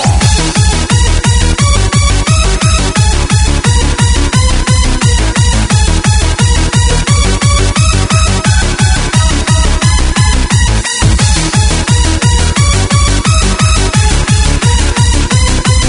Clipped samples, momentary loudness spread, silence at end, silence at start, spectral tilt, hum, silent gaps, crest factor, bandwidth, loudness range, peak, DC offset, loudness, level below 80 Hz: under 0.1%; 1 LU; 0 s; 0 s; -4 dB/octave; none; none; 8 dB; 11 kHz; 0 LU; 0 dBFS; under 0.1%; -9 LUFS; -12 dBFS